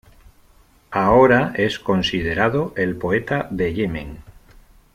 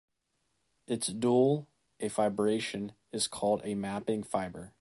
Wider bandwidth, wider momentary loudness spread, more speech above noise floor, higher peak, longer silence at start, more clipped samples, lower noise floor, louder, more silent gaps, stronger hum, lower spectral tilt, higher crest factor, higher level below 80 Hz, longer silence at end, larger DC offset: first, 15.5 kHz vs 12 kHz; about the same, 11 LU vs 12 LU; second, 34 dB vs 48 dB; first, -2 dBFS vs -14 dBFS; about the same, 0.9 s vs 0.9 s; neither; second, -53 dBFS vs -79 dBFS; first, -19 LUFS vs -32 LUFS; neither; neither; first, -6.5 dB/octave vs -5 dB/octave; about the same, 18 dB vs 18 dB; first, -42 dBFS vs -66 dBFS; first, 0.65 s vs 0.1 s; neither